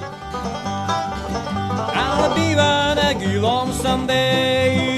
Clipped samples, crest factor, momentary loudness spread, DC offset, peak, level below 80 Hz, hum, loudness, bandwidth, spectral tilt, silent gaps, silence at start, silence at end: under 0.1%; 16 dB; 9 LU; under 0.1%; -4 dBFS; -38 dBFS; none; -19 LUFS; 14 kHz; -4.5 dB/octave; none; 0 s; 0 s